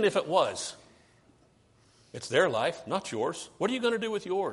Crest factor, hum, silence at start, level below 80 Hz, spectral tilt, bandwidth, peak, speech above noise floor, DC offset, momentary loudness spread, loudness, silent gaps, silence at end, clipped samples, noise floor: 20 dB; none; 0 s; -70 dBFS; -4 dB/octave; 11.5 kHz; -10 dBFS; 34 dB; under 0.1%; 11 LU; -29 LUFS; none; 0 s; under 0.1%; -63 dBFS